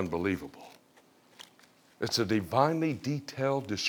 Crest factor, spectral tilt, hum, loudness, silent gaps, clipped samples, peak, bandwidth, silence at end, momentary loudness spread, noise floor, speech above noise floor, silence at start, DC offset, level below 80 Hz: 22 dB; -5 dB/octave; none; -30 LUFS; none; under 0.1%; -10 dBFS; over 20 kHz; 0 s; 25 LU; -62 dBFS; 32 dB; 0 s; under 0.1%; -64 dBFS